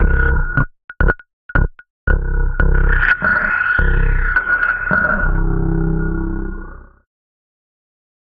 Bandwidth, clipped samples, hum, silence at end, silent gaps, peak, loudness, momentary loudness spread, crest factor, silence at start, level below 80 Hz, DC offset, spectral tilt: 4.6 kHz; under 0.1%; none; 1.5 s; 0.84-0.88 s, 1.33-1.49 s, 1.90-2.07 s; -2 dBFS; -17 LUFS; 10 LU; 14 dB; 0 s; -18 dBFS; under 0.1%; -6 dB/octave